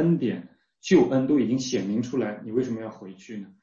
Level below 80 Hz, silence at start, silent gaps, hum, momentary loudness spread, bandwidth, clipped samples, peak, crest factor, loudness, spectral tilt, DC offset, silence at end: -62 dBFS; 0 s; none; none; 19 LU; 7.6 kHz; under 0.1%; -8 dBFS; 18 dB; -25 LUFS; -6.5 dB/octave; under 0.1%; 0.15 s